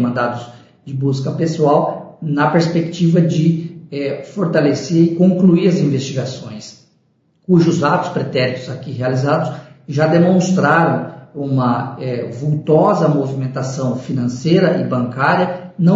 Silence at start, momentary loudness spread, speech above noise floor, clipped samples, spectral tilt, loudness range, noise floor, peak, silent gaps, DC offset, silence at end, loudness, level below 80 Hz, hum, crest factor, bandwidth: 0 s; 12 LU; 44 dB; under 0.1%; -7 dB/octave; 3 LU; -59 dBFS; -2 dBFS; none; under 0.1%; 0 s; -16 LUFS; -58 dBFS; none; 14 dB; 7.8 kHz